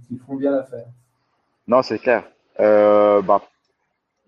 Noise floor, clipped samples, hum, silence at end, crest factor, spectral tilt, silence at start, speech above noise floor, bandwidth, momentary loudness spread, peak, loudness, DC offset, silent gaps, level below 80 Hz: -73 dBFS; under 0.1%; none; 0.9 s; 18 dB; -7 dB/octave; 0.1 s; 56 dB; 6.8 kHz; 19 LU; -2 dBFS; -17 LUFS; under 0.1%; none; -68 dBFS